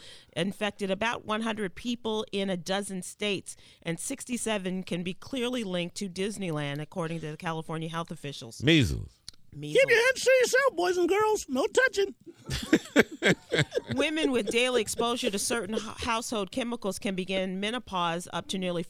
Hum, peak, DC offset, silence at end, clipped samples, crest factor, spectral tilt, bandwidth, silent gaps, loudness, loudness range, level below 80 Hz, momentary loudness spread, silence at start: none; -4 dBFS; under 0.1%; 0 s; under 0.1%; 24 dB; -4 dB/octave; 16.5 kHz; none; -29 LUFS; 8 LU; -52 dBFS; 12 LU; 0 s